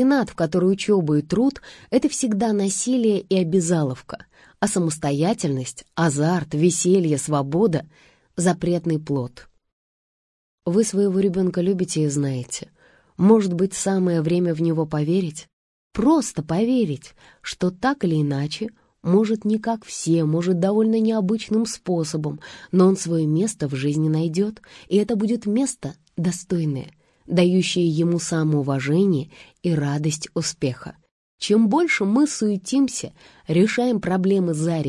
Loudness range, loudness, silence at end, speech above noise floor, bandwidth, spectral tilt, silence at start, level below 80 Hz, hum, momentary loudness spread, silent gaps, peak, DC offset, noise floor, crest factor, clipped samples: 3 LU; -21 LUFS; 0 s; over 69 dB; 12 kHz; -6 dB/octave; 0 s; -56 dBFS; none; 10 LU; 9.72-10.58 s, 15.53-15.90 s, 31.11-31.38 s; -4 dBFS; under 0.1%; under -90 dBFS; 18 dB; under 0.1%